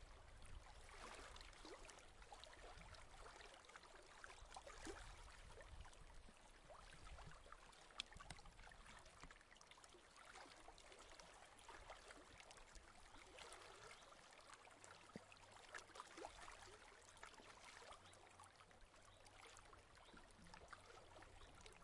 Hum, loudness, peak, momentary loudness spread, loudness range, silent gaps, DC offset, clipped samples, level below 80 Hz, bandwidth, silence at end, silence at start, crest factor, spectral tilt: none; -62 LUFS; -28 dBFS; 7 LU; 3 LU; none; under 0.1%; under 0.1%; -68 dBFS; 12 kHz; 0 s; 0 s; 34 dB; -2.5 dB/octave